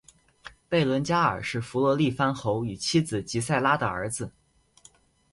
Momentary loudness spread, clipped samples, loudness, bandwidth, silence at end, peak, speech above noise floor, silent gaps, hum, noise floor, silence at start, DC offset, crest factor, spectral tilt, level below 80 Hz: 8 LU; under 0.1%; -26 LUFS; 11.5 kHz; 1.05 s; -10 dBFS; 33 dB; none; none; -58 dBFS; 0.45 s; under 0.1%; 18 dB; -5 dB/octave; -56 dBFS